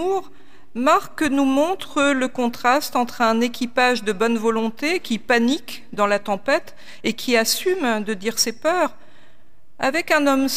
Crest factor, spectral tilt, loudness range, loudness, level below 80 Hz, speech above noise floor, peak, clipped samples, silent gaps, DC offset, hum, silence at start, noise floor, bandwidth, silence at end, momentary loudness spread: 16 dB; -3 dB/octave; 2 LU; -20 LUFS; -58 dBFS; 37 dB; -4 dBFS; under 0.1%; none; 2%; none; 0 s; -57 dBFS; 16 kHz; 0 s; 6 LU